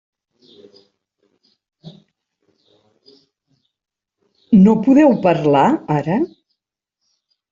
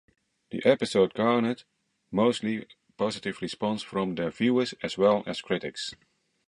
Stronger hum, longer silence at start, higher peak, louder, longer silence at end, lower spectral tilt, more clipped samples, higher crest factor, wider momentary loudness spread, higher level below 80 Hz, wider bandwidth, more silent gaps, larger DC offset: neither; first, 1.85 s vs 0.5 s; first, -2 dBFS vs -6 dBFS; first, -14 LUFS vs -27 LUFS; first, 1.25 s vs 0.55 s; first, -8.5 dB/octave vs -5.5 dB/octave; neither; about the same, 16 dB vs 20 dB; about the same, 9 LU vs 11 LU; first, -58 dBFS vs -66 dBFS; second, 7.6 kHz vs 11.5 kHz; neither; neither